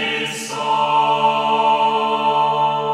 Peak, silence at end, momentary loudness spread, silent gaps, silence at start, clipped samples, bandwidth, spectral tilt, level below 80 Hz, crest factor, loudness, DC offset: -4 dBFS; 0 s; 6 LU; none; 0 s; under 0.1%; 14 kHz; -3 dB/octave; -70 dBFS; 12 dB; -17 LUFS; under 0.1%